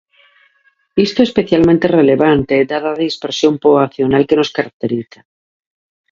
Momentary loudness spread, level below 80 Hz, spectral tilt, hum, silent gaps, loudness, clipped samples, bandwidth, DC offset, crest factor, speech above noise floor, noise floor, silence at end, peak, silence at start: 9 LU; -46 dBFS; -6.5 dB/octave; none; 4.73-4.80 s; -14 LUFS; under 0.1%; 7.6 kHz; under 0.1%; 14 dB; 44 dB; -57 dBFS; 1.1 s; 0 dBFS; 0.95 s